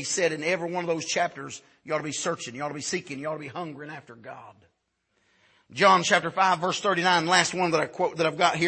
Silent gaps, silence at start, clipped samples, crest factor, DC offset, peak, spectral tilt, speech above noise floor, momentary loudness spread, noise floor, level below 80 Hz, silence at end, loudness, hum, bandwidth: none; 0 s; under 0.1%; 22 dB; under 0.1%; -4 dBFS; -3 dB/octave; 48 dB; 20 LU; -74 dBFS; -72 dBFS; 0 s; -25 LUFS; none; 8.8 kHz